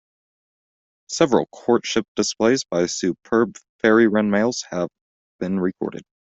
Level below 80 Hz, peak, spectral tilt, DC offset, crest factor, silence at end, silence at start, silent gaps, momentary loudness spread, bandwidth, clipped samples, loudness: -60 dBFS; -4 dBFS; -4.5 dB/octave; under 0.1%; 18 dB; 0.25 s; 1.1 s; 2.08-2.15 s, 3.69-3.79 s, 5.01-5.39 s; 11 LU; 8.2 kHz; under 0.1%; -21 LUFS